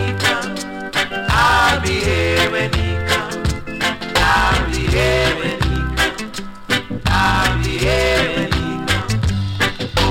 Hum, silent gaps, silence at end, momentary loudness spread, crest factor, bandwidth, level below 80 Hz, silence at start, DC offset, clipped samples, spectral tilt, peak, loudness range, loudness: none; none; 0 s; 7 LU; 16 dB; 17 kHz; -26 dBFS; 0 s; under 0.1%; under 0.1%; -4.5 dB/octave; -2 dBFS; 1 LU; -17 LUFS